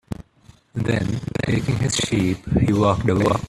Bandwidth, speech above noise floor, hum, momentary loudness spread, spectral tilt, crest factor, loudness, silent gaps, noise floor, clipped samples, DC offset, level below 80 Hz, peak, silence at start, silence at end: 13 kHz; 32 dB; none; 10 LU; -5.5 dB/octave; 18 dB; -21 LUFS; none; -52 dBFS; under 0.1%; under 0.1%; -40 dBFS; -4 dBFS; 0.1 s; 0 s